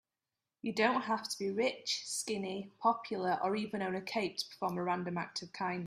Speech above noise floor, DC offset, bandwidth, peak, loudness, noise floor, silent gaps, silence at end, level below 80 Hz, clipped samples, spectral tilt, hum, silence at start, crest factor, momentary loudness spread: over 54 dB; under 0.1%; 15 kHz; -16 dBFS; -36 LUFS; under -90 dBFS; none; 0 s; -78 dBFS; under 0.1%; -3.5 dB/octave; none; 0.65 s; 20 dB; 7 LU